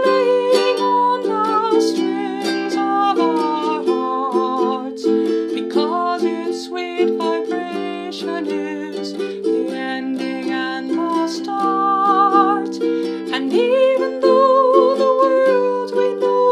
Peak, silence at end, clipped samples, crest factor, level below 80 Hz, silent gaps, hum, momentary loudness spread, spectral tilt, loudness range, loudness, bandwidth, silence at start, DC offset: 0 dBFS; 0 s; under 0.1%; 16 dB; -70 dBFS; none; none; 10 LU; -5 dB/octave; 7 LU; -18 LUFS; 12.5 kHz; 0 s; under 0.1%